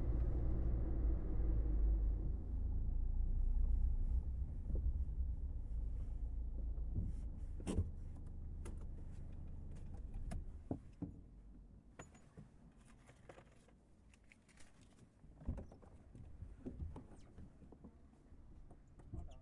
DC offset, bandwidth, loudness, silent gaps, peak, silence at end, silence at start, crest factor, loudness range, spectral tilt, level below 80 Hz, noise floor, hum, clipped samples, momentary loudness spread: under 0.1%; 10.5 kHz; -45 LUFS; none; -28 dBFS; 0 s; 0 s; 14 dB; 17 LU; -8.5 dB/octave; -42 dBFS; -66 dBFS; none; under 0.1%; 23 LU